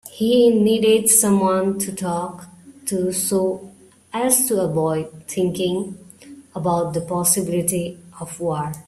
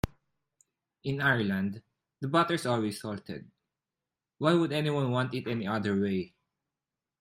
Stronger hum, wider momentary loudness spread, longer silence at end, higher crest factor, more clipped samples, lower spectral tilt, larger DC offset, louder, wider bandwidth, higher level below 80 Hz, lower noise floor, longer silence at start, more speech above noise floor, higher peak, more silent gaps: neither; first, 17 LU vs 13 LU; second, 0.05 s vs 0.95 s; about the same, 20 dB vs 20 dB; neither; second, -4.5 dB/octave vs -6.5 dB/octave; neither; first, -19 LUFS vs -30 LUFS; about the same, 16 kHz vs 15.5 kHz; about the same, -58 dBFS vs -56 dBFS; second, -43 dBFS vs under -90 dBFS; about the same, 0.05 s vs 0.05 s; second, 24 dB vs over 61 dB; first, 0 dBFS vs -12 dBFS; neither